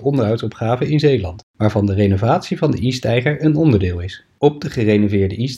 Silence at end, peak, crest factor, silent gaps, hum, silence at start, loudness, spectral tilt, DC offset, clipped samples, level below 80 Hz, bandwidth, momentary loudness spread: 0 s; 0 dBFS; 16 dB; 1.43-1.54 s; none; 0 s; -17 LUFS; -7.5 dB/octave; under 0.1%; under 0.1%; -46 dBFS; 11.5 kHz; 6 LU